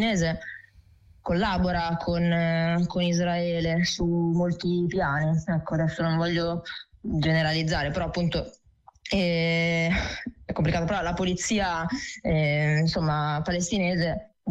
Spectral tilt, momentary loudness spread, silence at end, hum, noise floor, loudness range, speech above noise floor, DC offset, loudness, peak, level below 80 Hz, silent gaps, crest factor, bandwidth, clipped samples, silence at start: -5.5 dB/octave; 8 LU; 0 s; none; -55 dBFS; 2 LU; 30 dB; under 0.1%; -26 LUFS; -16 dBFS; -44 dBFS; none; 10 dB; 8.4 kHz; under 0.1%; 0 s